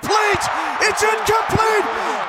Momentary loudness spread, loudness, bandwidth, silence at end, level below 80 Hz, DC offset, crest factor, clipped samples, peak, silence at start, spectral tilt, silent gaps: 3 LU; -17 LUFS; 16.5 kHz; 0 s; -46 dBFS; under 0.1%; 14 dB; under 0.1%; -4 dBFS; 0 s; -3 dB/octave; none